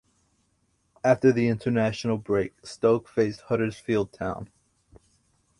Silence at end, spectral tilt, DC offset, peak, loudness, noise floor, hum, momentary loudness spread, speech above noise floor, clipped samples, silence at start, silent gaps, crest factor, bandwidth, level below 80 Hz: 1.15 s; -7 dB/octave; under 0.1%; -6 dBFS; -25 LUFS; -70 dBFS; none; 12 LU; 45 dB; under 0.1%; 1.05 s; none; 20 dB; 11.5 kHz; -56 dBFS